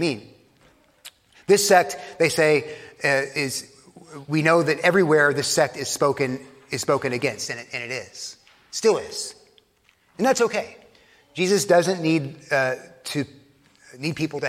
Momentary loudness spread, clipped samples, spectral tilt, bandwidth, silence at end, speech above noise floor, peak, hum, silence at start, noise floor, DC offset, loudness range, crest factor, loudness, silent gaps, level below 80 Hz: 17 LU; under 0.1%; -4 dB/octave; 16.5 kHz; 0 s; 40 dB; -2 dBFS; none; 0 s; -62 dBFS; under 0.1%; 5 LU; 22 dB; -22 LUFS; none; -66 dBFS